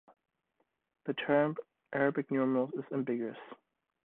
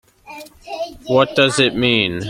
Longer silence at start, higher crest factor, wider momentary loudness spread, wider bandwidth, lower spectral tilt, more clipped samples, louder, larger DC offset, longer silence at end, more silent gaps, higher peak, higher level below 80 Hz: first, 1.05 s vs 0.25 s; about the same, 20 dB vs 18 dB; second, 15 LU vs 22 LU; second, 4 kHz vs 16 kHz; first, -10 dB/octave vs -4 dB/octave; neither; second, -33 LUFS vs -15 LUFS; neither; first, 0.5 s vs 0 s; neither; second, -14 dBFS vs 0 dBFS; second, -78 dBFS vs -48 dBFS